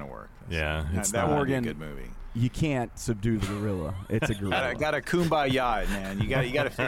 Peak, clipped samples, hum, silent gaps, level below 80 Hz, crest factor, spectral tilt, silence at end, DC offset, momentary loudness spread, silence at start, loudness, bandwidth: -14 dBFS; under 0.1%; none; none; -40 dBFS; 14 dB; -5 dB/octave; 0 s; under 0.1%; 9 LU; 0 s; -28 LUFS; 17 kHz